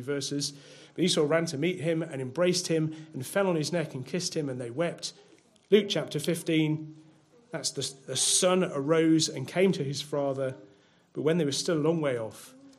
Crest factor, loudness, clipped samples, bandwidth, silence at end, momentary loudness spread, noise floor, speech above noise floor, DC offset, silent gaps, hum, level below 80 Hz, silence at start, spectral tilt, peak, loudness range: 20 dB; -28 LUFS; under 0.1%; 15.5 kHz; 0.1 s; 11 LU; -60 dBFS; 31 dB; under 0.1%; none; none; -76 dBFS; 0 s; -4 dB/octave; -8 dBFS; 3 LU